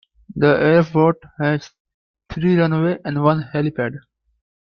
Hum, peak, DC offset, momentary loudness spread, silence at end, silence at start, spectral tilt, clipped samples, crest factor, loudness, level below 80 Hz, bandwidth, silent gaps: none; -2 dBFS; under 0.1%; 11 LU; 0.7 s; 0.3 s; -8.5 dB/octave; under 0.1%; 18 dB; -18 LUFS; -52 dBFS; 6.6 kHz; 1.80-1.85 s, 1.94-2.14 s